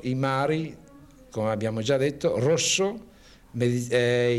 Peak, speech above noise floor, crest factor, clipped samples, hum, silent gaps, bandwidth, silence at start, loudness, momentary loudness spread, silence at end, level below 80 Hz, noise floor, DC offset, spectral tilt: -8 dBFS; 26 dB; 16 dB; under 0.1%; none; none; 14.5 kHz; 0 s; -25 LUFS; 13 LU; 0 s; -58 dBFS; -50 dBFS; under 0.1%; -4.5 dB/octave